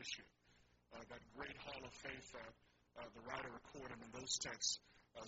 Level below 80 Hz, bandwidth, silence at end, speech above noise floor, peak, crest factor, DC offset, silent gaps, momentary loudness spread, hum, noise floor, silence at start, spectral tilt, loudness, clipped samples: -74 dBFS; 7.6 kHz; 0 s; 23 dB; -26 dBFS; 26 dB; under 0.1%; none; 18 LU; 60 Hz at -75 dBFS; -74 dBFS; 0 s; -1 dB/octave; -48 LUFS; under 0.1%